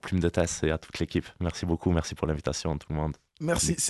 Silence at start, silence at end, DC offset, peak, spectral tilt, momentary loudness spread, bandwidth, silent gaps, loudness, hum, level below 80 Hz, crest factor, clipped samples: 0.05 s; 0 s; under 0.1%; -10 dBFS; -4.5 dB/octave; 6 LU; 12.5 kHz; none; -30 LUFS; none; -38 dBFS; 18 dB; under 0.1%